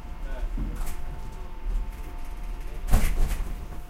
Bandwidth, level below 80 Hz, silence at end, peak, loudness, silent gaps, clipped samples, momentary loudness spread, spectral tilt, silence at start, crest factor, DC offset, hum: 16 kHz; -28 dBFS; 0 s; -4 dBFS; -34 LUFS; none; under 0.1%; 13 LU; -5.5 dB/octave; 0 s; 22 dB; under 0.1%; none